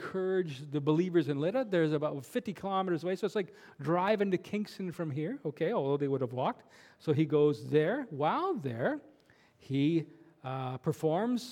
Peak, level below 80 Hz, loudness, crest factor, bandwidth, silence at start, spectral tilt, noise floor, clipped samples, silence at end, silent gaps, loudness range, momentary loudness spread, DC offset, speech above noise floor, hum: -14 dBFS; -78 dBFS; -32 LUFS; 18 dB; 16 kHz; 0 s; -7.5 dB/octave; -64 dBFS; under 0.1%; 0 s; none; 3 LU; 9 LU; under 0.1%; 32 dB; none